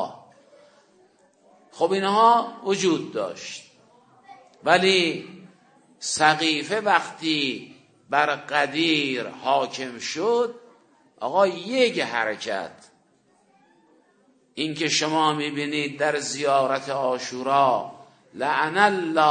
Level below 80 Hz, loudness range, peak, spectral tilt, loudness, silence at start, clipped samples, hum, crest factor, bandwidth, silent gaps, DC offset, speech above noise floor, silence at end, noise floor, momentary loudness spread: -78 dBFS; 4 LU; 0 dBFS; -3 dB/octave; -23 LUFS; 0 s; under 0.1%; none; 24 dB; 9.6 kHz; none; under 0.1%; 40 dB; 0 s; -62 dBFS; 11 LU